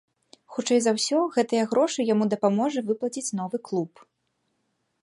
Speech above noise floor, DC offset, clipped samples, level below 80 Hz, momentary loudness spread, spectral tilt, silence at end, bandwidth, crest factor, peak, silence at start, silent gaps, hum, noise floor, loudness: 51 dB; under 0.1%; under 0.1%; -78 dBFS; 8 LU; -4.5 dB/octave; 1.15 s; 11.5 kHz; 18 dB; -8 dBFS; 0.5 s; none; none; -75 dBFS; -25 LUFS